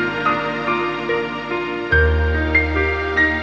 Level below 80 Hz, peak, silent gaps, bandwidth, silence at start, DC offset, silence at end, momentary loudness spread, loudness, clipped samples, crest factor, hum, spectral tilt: -26 dBFS; -2 dBFS; none; 7 kHz; 0 s; under 0.1%; 0 s; 7 LU; -19 LUFS; under 0.1%; 16 dB; none; -7 dB/octave